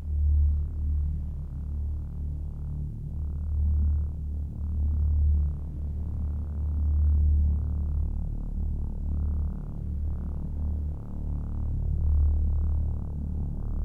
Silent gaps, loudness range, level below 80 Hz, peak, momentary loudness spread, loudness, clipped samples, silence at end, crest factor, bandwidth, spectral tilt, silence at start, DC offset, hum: none; 5 LU; -28 dBFS; -14 dBFS; 10 LU; -30 LUFS; under 0.1%; 0 s; 12 dB; 1.4 kHz; -11.5 dB/octave; 0 s; under 0.1%; none